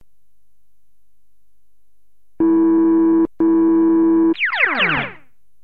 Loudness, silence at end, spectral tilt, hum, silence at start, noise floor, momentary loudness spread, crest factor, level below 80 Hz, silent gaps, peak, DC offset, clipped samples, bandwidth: -15 LUFS; 0.5 s; -8 dB/octave; none; 2.4 s; -71 dBFS; 4 LU; 14 dB; -52 dBFS; none; -4 dBFS; 1%; under 0.1%; 4.7 kHz